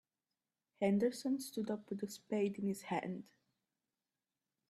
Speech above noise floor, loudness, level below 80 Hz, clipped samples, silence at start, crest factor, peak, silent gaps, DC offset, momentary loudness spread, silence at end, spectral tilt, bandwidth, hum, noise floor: over 52 dB; -39 LUFS; -82 dBFS; under 0.1%; 0.8 s; 18 dB; -22 dBFS; none; under 0.1%; 10 LU; 1.45 s; -6 dB/octave; 14 kHz; none; under -90 dBFS